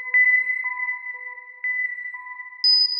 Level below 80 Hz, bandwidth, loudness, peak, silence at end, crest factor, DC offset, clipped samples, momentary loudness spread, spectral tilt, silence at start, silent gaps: under -90 dBFS; 6 kHz; -20 LUFS; -10 dBFS; 0 s; 12 dB; under 0.1%; under 0.1%; 18 LU; 3 dB/octave; 0 s; none